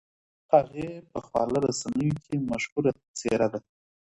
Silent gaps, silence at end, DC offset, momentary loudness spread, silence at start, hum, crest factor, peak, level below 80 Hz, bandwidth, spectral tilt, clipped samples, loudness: 2.72-2.76 s, 3.08-3.14 s; 0.45 s; under 0.1%; 12 LU; 0.5 s; none; 22 dB; -6 dBFS; -58 dBFS; 11.5 kHz; -6 dB/octave; under 0.1%; -27 LUFS